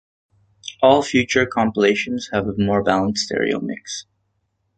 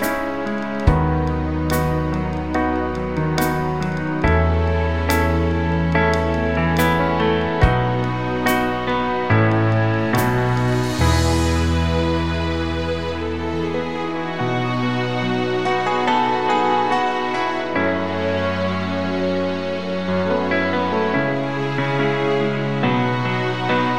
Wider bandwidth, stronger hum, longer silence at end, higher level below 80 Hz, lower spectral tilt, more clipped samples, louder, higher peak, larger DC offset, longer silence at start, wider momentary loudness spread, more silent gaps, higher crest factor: second, 9.2 kHz vs 16 kHz; neither; first, 0.75 s vs 0 s; second, -50 dBFS vs -30 dBFS; second, -4.5 dB/octave vs -6.5 dB/octave; neither; about the same, -19 LUFS vs -20 LUFS; about the same, -2 dBFS vs -2 dBFS; second, under 0.1% vs 1%; first, 0.65 s vs 0 s; first, 15 LU vs 5 LU; neither; about the same, 18 dB vs 18 dB